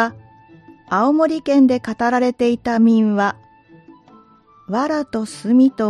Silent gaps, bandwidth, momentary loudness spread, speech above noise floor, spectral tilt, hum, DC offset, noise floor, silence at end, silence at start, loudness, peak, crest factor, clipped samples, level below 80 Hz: none; 11 kHz; 9 LU; 34 dB; -6.5 dB/octave; none; under 0.1%; -50 dBFS; 0 s; 0 s; -17 LUFS; -4 dBFS; 14 dB; under 0.1%; -58 dBFS